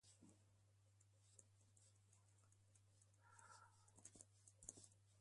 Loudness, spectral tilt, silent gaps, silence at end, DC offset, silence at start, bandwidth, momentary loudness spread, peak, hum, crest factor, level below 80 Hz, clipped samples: -65 LUFS; -3 dB/octave; none; 0 s; under 0.1%; 0 s; 11.5 kHz; 8 LU; -32 dBFS; none; 38 dB; -86 dBFS; under 0.1%